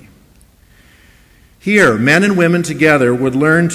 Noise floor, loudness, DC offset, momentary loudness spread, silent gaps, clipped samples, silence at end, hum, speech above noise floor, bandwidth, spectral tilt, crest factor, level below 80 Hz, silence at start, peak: -47 dBFS; -12 LUFS; under 0.1%; 4 LU; none; under 0.1%; 0 s; none; 36 dB; 16 kHz; -5.5 dB/octave; 14 dB; -48 dBFS; 1.65 s; 0 dBFS